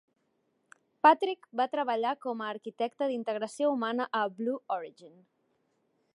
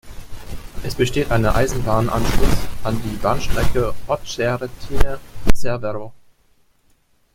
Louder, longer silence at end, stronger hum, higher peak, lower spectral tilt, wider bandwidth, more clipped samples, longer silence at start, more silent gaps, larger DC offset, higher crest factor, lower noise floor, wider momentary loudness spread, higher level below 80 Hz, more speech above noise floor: second, -30 LUFS vs -22 LUFS; second, 1.05 s vs 1.2 s; neither; second, -8 dBFS vs 0 dBFS; about the same, -4.5 dB/octave vs -5.5 dB/octave; second, 11.5 kHz vs 16 kHz; neither; first, 1.05 s vs 0.05 s; neither; neither; first, 24 dB vs 16 dB; first, -76 dBFS vs -58 dBFS; about the same, 13 LU vs 13 LU; second, -88 dBFS vs -26 dBFS; first, 46 dB vs 42 dB